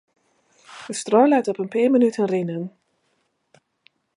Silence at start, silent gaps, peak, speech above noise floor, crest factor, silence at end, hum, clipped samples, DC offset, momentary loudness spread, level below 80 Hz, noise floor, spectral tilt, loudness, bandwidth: 0.7 s; none; -2 dBFS; 50 dB; 20 dB; 1.5 s; none; under 0.1%; under 0.1%; 15 LU; -76 dBFS; -70 dBFS; -6 dB/octave; -20 LUFS; 11.5 kHz